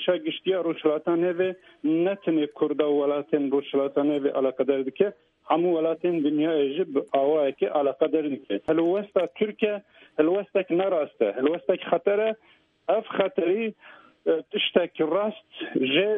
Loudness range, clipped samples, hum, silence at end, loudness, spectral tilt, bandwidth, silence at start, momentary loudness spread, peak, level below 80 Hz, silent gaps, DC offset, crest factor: 2 LU; under 0.1%; none; 0 s; -25 LUFS; -8 dB/octave; 3.9 kHz; 0 s; 5 LU; -6 dBFS; -72 dBFS; none; under 0.1%; 20 dB